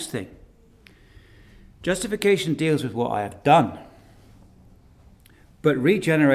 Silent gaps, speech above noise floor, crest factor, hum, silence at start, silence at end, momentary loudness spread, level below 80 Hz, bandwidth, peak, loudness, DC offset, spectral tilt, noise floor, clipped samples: none; 32 dB; 20 dB; none; 0 s; 0 s; 13 LU; -54 dBFS; 15.5 kHz; -4 dBFS; -22 LUFS; under 0.1%; -5.5 dB/octave; -53 dBFS; under 0.1%